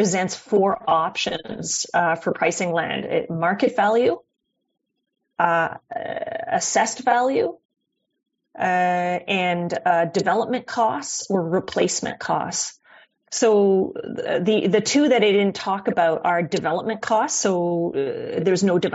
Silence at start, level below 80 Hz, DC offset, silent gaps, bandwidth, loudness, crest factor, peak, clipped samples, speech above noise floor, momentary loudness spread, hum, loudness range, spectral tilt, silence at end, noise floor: 0 s; -64 dBFS; under 0.1%; 7.65-7.69 s; 8 kHz; -21 LUFS; 18 dB; -4 dBFS; under 0.1%; 32 dB; 8 LU; none; 3 LU; -3.5 dB/octave; 0 s; -53 dBFS